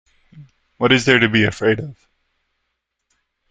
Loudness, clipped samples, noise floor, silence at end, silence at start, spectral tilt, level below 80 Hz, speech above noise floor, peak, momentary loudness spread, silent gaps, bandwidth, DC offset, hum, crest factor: -16 LUFS; under 0.1%; -75 dBFS; 1.6 s; 0.35 s; -5 dB/octave; -52 dBFS; 59 dB; -2 dBFS; 10 LU; none; 9.4 kHz; under 0.1%; none; 20 dB